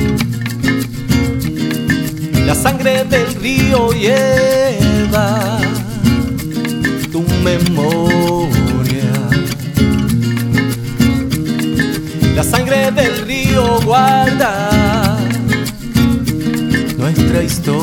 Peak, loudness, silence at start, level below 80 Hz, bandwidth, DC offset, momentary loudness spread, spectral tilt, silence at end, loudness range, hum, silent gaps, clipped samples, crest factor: 0 dBFS; -14 LUFS; 0 s; -28 dBFS; 20 kHz; under 0.1%; 5 LU; -5.5 dB/octave; 0 s; 2 LU; none; none; under 0.1%; 12 dB